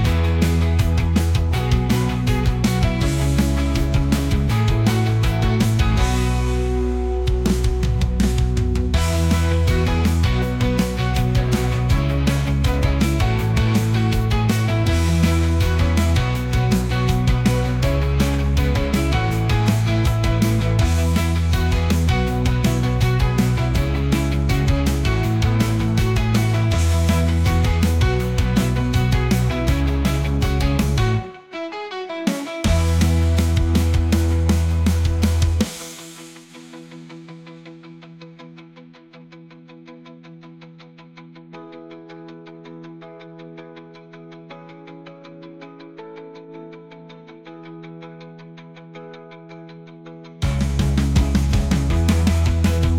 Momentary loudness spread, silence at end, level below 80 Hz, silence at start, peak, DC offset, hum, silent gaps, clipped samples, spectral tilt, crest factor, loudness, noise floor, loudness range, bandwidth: 21 LU; 0 s; -26 dBFS; 0 s; -6 dBFS; under 0.1%; none; none; under 0.1%; -6 dB/octave; 14 dB; -19 LUFS; -44 dBFS; 21 LU; 17 kHz